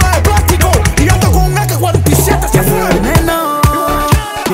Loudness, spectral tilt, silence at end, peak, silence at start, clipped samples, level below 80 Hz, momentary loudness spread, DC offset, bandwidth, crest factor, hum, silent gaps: -11 LUFS; -5 dB/octave; 0 s; 0 dBFS; 0 s; under 0.1%; -18 dBFS; 3 LU; under 0.1%; 16.5 kHz; 10 dB; none; none